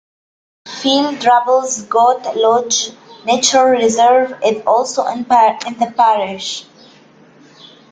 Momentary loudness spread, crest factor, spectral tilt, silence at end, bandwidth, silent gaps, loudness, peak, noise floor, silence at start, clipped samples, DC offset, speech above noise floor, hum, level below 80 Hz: 9 LU; 14 dB; -2 dB/octave; 1.3 s; 9.6 kHz; none; -14 LUFS; 0 dBFS; -45 dBFS; 0.65 s; under 0.1%; under 0.1%; 32 dB; none; -62 dBFS